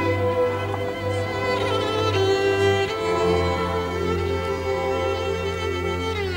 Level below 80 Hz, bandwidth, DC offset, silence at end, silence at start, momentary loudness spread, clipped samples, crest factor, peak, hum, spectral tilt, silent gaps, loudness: -42 dBFS; 16 kHz; under 0.1%; 0 s; 0 s; 5 LU; under 0.1%; 14 dB; -8 dBFS; none; -5.5 dB/octave; none; -23 LUFS